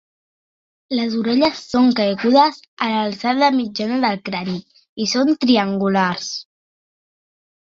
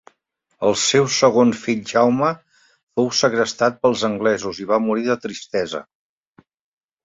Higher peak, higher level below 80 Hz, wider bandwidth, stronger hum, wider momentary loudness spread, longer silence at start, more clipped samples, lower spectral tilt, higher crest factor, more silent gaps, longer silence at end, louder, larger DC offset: about the same, -2 dBFS vs -2 dBFS; about the same, -62 dBFS vs -60 dBFS; about the same, 7.4 kHz vs 7.8 kHz; neither; about the same, 10 LU vs 9 LU; first, 0.9 s vs 0.6 s; neither; about the same, -5 dB/octave vs -4 dB/octave; about the same, 18 dB vs 18 dB; first, 2.68-2.77 s, 4.89-4.96 s vs 2.83-2.87 s; about the same, 1.3 s vs 1.2 s; about the same, -18 LUFS vs -19 LUFS; neither